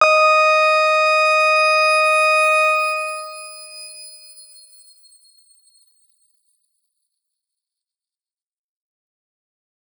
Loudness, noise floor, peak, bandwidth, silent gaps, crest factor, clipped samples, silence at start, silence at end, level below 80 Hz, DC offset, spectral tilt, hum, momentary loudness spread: -14 LUFS; under -90 dBFS; -2 dBFS; over 20 kHz; none; 18 dB; under 0.1%; 0 s; 5.8 s; under -90 dBFS; under 0.1%; 3.5 dB/octave; none; 21 LU